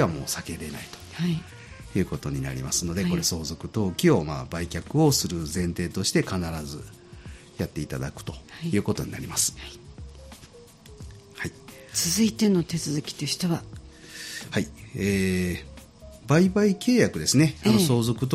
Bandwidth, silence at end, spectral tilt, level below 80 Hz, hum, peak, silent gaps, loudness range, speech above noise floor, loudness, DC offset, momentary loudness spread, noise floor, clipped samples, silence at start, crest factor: 14.5 kHz; 0 s; -4.5 dB/octave; -48 dBFS; none; -6 dBFS; none; 7 LU; 24 dB; -26 LUFS; under 0.1%; 23 LU; -49 dBFS; under 0.1%; 0 s; 20 dB